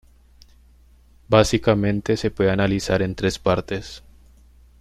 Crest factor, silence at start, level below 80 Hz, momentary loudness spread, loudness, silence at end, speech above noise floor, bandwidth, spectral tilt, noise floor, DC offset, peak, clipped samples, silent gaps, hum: 20 dB; 1.3 s; -40 dBFS; 13 LU; -21 LUFS; 0.8 s; 32 dB; 14 kHz; -5.5 dB/octave; -52 dBFS; under 0.1%; -2 dBFS; under 0.1%; none; none